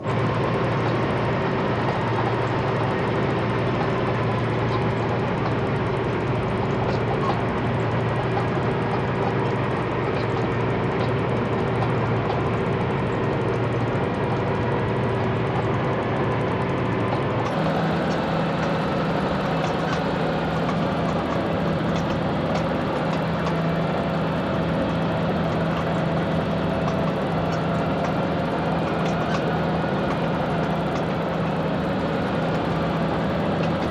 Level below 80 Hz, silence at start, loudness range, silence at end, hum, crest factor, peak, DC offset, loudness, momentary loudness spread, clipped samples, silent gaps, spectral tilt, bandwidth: -42 dBFS; 0 s; 1 LU; 0 s; none; 12 dB; -10 dBFS; under 0.1%; -23 LUFS; 1 LU; under 0.1%; none; -7.5 dB/octave; 10 kHz